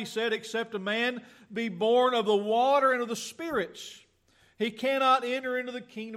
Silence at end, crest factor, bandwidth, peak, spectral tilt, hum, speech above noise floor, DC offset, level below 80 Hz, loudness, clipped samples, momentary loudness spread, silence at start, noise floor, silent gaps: 0 s; 16 dB; 14.5 kHz; -12 dBFS; -3.5 dB/octave; none; 37 dB; under 0.1%; -72 dBFS; -28 LUFS; under 0.1%; 14 LU; 0 s; -65 dBFS; none